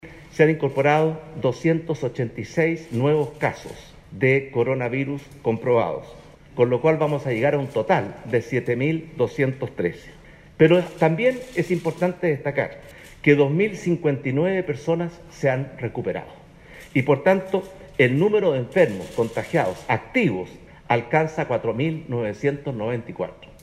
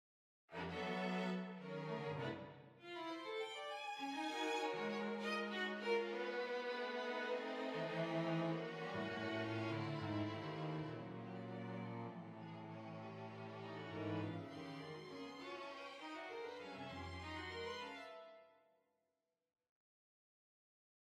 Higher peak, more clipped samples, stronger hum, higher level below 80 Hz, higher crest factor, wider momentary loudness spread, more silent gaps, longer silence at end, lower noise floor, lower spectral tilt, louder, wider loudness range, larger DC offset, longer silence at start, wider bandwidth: first, -4 dBFS vs -28 dBFS; neither; neither; first, -54 dBFS vs -78 dBFS; about the same, 20 dB vs 18 dB; about the same, 10 LU vs 10 LU; neither; second, 0.2 s vs 2.5 s; second, -45 dBFS vs -90 dBFS; first, -7.5 dB/octave vs -6 dB/octave; first, -22 LUFS vs -46 LUFS; second, 3 LU vs 8 LU; neither; second, 0.05 s vs 0.5 s; about the same, 13 kHz vs 14 kHz